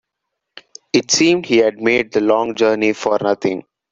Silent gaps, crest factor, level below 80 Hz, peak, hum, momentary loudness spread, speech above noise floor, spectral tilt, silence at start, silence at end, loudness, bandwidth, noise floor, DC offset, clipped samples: none; 16 dB; -58 dBFS; -2 dBFS; none; 6 LU; 62 dB; -3.5 dB/octave; 0.95 s; 0.3 s; -16 LUFS; 7.8 kHz; -78 dBFS; under 0.1%; under 0.1%